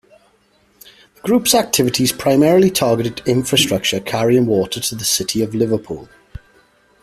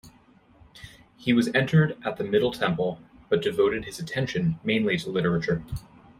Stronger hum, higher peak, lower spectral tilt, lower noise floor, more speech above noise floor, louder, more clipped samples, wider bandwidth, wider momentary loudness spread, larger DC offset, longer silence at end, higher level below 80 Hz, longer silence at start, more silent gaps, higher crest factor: neither; first, 0 dBFS vs -8 dBFS; second, -4 dB/octave vs -6.5 dB/octave; about the same, -57 dBFS vs -57 dBFS; first, 41 dB vs 32 dB; first, -16 LUFS vs -25 LUFS; neither; about the same, 15.5 kHz vs 15 kHz; second, 7 LU vs 10 LU; neither; first, 0.95 s vs 0.4 s; about the same, -48 dBFS vs -52 dBFS; first, 1.25 s vs 0.05 s; neither; about the same, 18 dB vs 18 dB